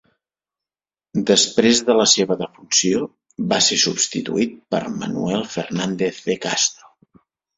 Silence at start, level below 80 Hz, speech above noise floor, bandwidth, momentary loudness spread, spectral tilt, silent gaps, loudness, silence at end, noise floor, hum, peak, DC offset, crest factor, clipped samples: 1.15 s; -58 dBFS; over 71 dB; 8.4 kHz; 10 LU; -2.5 dB/octave; none; -18 LUFS; 0.85 s; under -90 dBFS; none; -2 dBFS; under 0.1%; 20 dB; under 0.1%